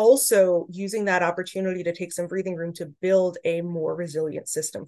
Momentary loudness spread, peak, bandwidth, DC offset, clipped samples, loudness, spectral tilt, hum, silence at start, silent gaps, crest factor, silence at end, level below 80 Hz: 11 LU; -6 dBFS; 13 kHz; under 0.1%; under 0.1%; -24 LUFS; -4 dB/octave; none; 0 s; none; 18 dB; 0 s; -74 dBFS